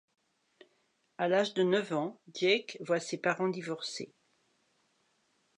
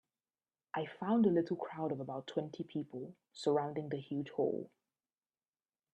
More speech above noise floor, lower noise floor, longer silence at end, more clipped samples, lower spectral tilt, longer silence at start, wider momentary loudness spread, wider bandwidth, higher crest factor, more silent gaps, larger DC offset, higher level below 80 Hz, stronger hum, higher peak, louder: second, 43 dB vs over 53 dB; second, -75 dBFS vs under -90 dBFS; first, 1.5 s vs 1.25 s; neither; second, -4.5 dB/octave vs -7.5 dB/octave; first, 1.2 s vs 0.75 s; about the same, 10 LU vs 12 LU; about the same, 10.5 kHz vs 9.8 kHz; about the same, 20 dB vs 18 dB; neither; neither; second, -88 dBFS vs -82 dBFS; neither; first, -14 dBFS vs -20 dBFS; first, -32 LUFS vs -37 LUFS